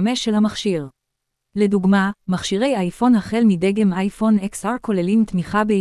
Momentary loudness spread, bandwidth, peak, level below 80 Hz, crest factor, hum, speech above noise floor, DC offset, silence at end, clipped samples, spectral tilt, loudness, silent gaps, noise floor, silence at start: 7 LU; 12 kHz; -4 dBFS; -50 dBFS; 14 dB; none; 60 dB; under 0.1%; 0 s; under 0.1%; -6 dB/octave; -19 LUFS; none; -78 dBFS; 0 s